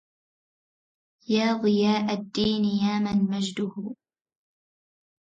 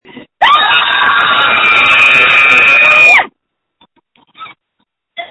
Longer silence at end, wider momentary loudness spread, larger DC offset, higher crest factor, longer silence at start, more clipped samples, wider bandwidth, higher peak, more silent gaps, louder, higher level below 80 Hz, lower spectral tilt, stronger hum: first, 1.4 s vs 0.05 s; first, 10 LU vs 5 LU; neither; first, 16 dB vs 10 dB; first, 1.3 s vs 0.15 s; second, under 0.1% vs 0.6%; second, 7.8 kHz vs 11 kHz; second, -12 dBFS vs 0 dBFS; neither; second, -25 LUFS vs -5 LUFS; second, -62 dBFS vs -50 dBFS; first, -6 dB/octave vs -1.5 dB/octave; neither